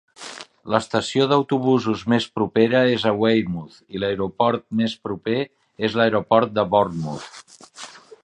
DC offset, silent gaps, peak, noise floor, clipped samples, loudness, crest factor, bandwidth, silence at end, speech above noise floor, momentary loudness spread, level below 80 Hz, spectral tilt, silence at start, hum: under 0.1%; none; -2 dBFS; -41 dBFS; under 0.1%; -21 LUFS; 20 dB; 10.5 kHz; 0.25 s; 21 dB; 18 LU; -56 dBFS; -6 dB/octave; 0.2 s; none